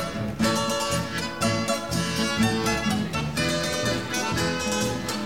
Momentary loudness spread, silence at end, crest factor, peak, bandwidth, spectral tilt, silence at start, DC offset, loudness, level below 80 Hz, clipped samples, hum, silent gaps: 3 LU; 0 s; 16 dB; -10 dBFS; 17 kHz; -4 dB/octave; 0 s; 0.4%; -25 LUFS; -46 dBFS; under 0.1%; none; none